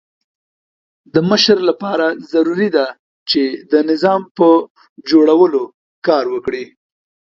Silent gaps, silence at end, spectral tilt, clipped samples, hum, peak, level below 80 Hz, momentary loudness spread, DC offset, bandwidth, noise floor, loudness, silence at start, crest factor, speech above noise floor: 2.99-3.26 s, 4.31-4.35 s, 4.70-4.75 s, 4.89-4.96 s, 5.74-6.02 s; 0.7 s; -5.5 dB/octave; under 0.1%; none; 0 dBFS; -60 dBFS; 13 LU; under 0.1%; 7.2 kHz; under -90 dBFS; -14 LUFS; 1.15 s; 16 dB; over 76 dB